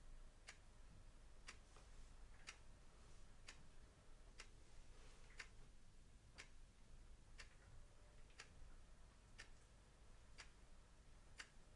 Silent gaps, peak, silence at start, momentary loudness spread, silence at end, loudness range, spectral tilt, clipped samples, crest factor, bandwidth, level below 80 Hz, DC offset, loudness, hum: none; -38 dBFS; 0 s; 8 LU; 0 s; 1 LU; -3 dB/octave; under 0.1%; 24 dB; 11 kHz; -64 dBFS; under 0.1%; -65 LUFS; none